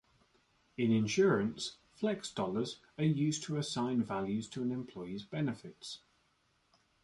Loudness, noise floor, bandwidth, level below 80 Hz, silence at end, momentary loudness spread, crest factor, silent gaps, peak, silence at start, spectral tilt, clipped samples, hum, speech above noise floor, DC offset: -35 LUFS; -75 dBFS; 11.5 kHz; -70 dBFS; 1.05 s; 15 LU; 18 dB; none; -18 dBFS; 0.8 s; -5.5 dB/octave; under 0.1%; none; 40 dB; under 0.1%